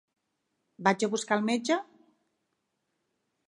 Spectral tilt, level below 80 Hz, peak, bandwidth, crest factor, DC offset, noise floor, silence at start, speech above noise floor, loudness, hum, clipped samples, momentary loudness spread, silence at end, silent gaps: -4 dB/octave; -82 dBFS; -8 dBFS; 11.5 kHz; 24 dB; under 0.1%; -80 dBFS; 0.8 s; 52 dB; -29 LUFS; none; under 0.1%; 4 LU; 1.65 s; none